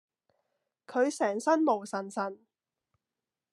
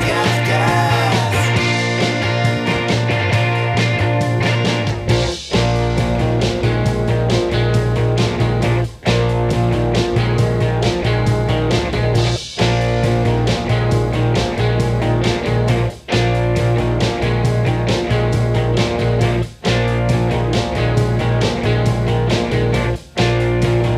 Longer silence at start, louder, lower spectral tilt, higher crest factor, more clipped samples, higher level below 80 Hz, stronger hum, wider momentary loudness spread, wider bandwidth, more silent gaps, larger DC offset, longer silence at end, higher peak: first, 0.9 s vs 0 s; second, -30 LUFS vs -17 LUFS; second, -4.5 dB/octave vs -6 dB/octave; first, 20 dB vs 14 dB; neither; second, under -90 dBFS vs -28 dBFS; neither; first, 9 LU vs 2 LU; about the same, 12.5 kHz vs 12 kHz; neither; neither; first, 1.15 s vs 0 s; second, -12 dBFS vs -2 dBFS